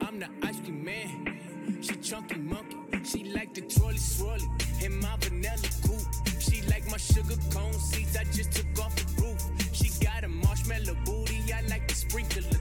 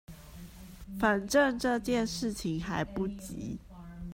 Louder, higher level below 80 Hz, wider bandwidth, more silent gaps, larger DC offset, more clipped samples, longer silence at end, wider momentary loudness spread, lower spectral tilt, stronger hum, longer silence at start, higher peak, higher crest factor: about the same, -31 LUFS vs -31 LUFS; first, -32 dBFS vs -50 dBFS; first, 18 kHz vs 16 kHz; neither; neither; neither; about the same, 0 s vs 0 s; second, 8 LU vs 23 LU; about the same, -4.5 dB/octave vs -5 dB/octave; neither; about the same, 0 s vs 0.1 s; about the same, -12 dBFS vs -12 dBFS; about the same, 18 dB vs 20 dB